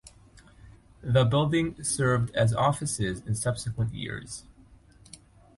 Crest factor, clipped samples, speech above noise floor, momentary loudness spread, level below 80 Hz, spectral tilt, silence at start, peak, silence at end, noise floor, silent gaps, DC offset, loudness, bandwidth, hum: 18 dB; under 0.1%; 29 dB; 13 LU; -50 dBFS; -5 dB/octave; 0.05 s; -10 dBFS; 1.15 s; -55 dBFS; none; under 0.1%; -27 LUFS; 11.5 kHz; none